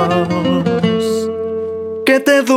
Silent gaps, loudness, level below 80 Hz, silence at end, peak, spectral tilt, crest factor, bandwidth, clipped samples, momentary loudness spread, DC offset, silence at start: none; -16 LUFS; -50 dBFS; 0 s; 0 dBFS; -5.5 dB/octave; 14 dB; 16.5 kHz; under 0.1%; 9 LU; under 0.1%; 0 s